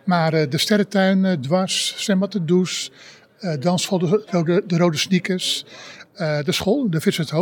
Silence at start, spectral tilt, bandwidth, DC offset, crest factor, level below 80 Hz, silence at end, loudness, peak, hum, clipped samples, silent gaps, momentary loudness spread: 0.05 s; -5 dB/octave; 18 kHz; under 0.1%; 18 dB; -62 dBFS; 0 s; -20 LUFS; -2 dBFS; none; under 0.1%; none; 9 LU